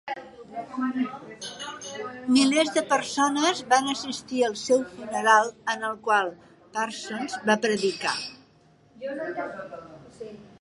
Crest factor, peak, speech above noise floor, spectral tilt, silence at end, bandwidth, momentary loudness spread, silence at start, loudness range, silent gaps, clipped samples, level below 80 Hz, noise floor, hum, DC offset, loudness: 22 dB; -4 dBFS; 33 dB; -2.5 dB/octave; 0.15 s; 11.5 kHz; 18 LU; 0.05 s; 5 LU; none; under 0.1%; -70 dBFS; -58 dBFS; none; under 0.1%; -25 LUFS